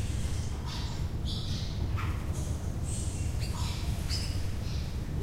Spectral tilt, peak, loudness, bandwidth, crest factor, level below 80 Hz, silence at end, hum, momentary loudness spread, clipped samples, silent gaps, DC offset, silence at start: -5 dB/octave; -20 dBFS; -34 LUFS; 16 kHz; 12 dB; -36 dBFS; 0 s; none; 3 LU; under 0.1%; none; under 0.1%; 0 s